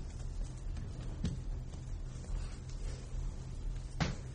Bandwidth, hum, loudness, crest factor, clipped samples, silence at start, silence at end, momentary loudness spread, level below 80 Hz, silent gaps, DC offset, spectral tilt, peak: 10 kHz; none; -44 LUFS; 20 dB; under 0.1%; 0 s; 0 s; 7 LU; -42 dBFS; none; under 0.1%; -5.5 dB/octave; -20 dBFS